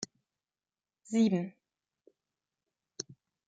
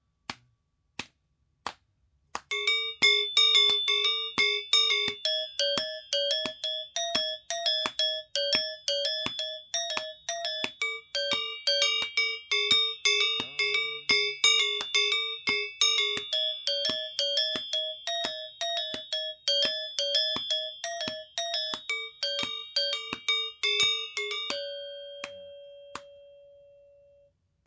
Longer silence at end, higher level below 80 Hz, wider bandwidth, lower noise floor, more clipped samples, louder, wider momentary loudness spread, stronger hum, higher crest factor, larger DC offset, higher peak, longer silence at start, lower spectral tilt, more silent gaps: second, 0.35 s vs 1.2 s; second, -82 dBFS vs -70 dBFS; first, 9.2 kHz vs 8 kHz; first, under -90 dBFS vs -73 dBFS; neither; second, -33 LUFS vs -26 LUFS; about the same, 16 LU vs 14 LU; neither; about the same, 20 dB vs 18 dB; neither; second, -18 dBFS vs -12 dBFS; second, 0 s vs 0.3 s; first, -5.5 dB/octave vs 0.5 dB/octave; neither